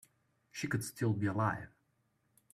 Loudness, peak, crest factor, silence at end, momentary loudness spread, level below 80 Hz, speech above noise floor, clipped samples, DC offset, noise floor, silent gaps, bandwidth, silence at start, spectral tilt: -36 LUFS; -20 dBFS; 18 dB; 0.85 s; 14 LU; -68 dBFS; 42 dB; under 0.1%; under 0.1%; -77 dBFS; none; 15 kHz; 0.55 s; -6 dB/octave